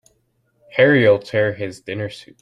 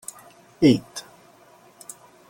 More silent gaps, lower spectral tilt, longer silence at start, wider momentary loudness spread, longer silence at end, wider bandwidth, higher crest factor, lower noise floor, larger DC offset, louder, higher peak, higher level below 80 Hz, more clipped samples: neither; first, -7 dB/octave vs -5.5 dB/octave; first, 0.75 s vs 0.6 s; second, 15 LU vs 23 LU; second, 0.2 s vs 1.3 s; second, 10.5 kHz vs 17 kHz; about the same, 18 dB vs 20 dB; first, -65 dBFS vs -53 dBFS; neither; first, -17 LUFS vs -20 LUFS; first, -2 dBFS vs -6 dBFS; about the same, -58 dBFS vs -60 dBFS; neither